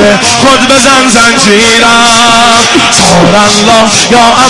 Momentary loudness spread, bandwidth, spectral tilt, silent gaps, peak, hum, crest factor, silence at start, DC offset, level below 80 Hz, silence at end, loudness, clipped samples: 1 LU; 12 kHz; -2.5 dB/octave; none; 0 dBFS; none; 4 dB; 0 s; under 0.1%; -32 dBFS; 0 s; -3 LUFS; 10%